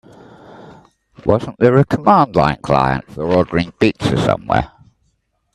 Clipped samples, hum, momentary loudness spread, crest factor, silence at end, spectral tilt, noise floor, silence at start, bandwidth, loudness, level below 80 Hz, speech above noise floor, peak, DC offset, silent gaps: under 0.1%; none; 7 LU; 16 dB; 0.85 s; -7.5 dB/octave; -65 dBFS; 1.25 s; 12 kHz; -16 LUFS; -40 dBFS; 50 dB; 0 dBFS; under 0.1%; none